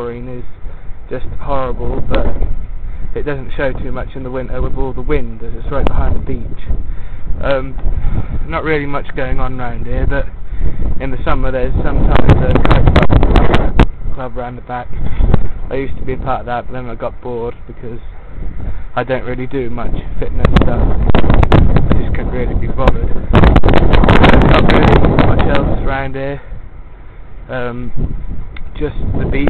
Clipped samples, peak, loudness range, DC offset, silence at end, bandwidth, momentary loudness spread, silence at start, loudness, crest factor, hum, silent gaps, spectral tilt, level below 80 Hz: under 0.1%; 0 dBFS; 12 LU; under 0.1%; 0 s; 4.4 kHz; 17 LU; 0 s; -16 LUFS; 10 dB; none; none; -8.5 dB/octave; -16 dBFS